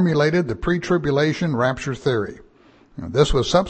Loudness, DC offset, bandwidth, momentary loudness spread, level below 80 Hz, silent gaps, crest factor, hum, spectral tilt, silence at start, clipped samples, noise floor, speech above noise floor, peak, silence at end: -20 LUFS; under 0.1%; 8.8 kHz; 8 LU; -36 dBFS; none; 16 dB; none; -6 dB/octave; 0 s; under 0.1%; -52 dBFS; 32 dB; -4 dBFS; 0 s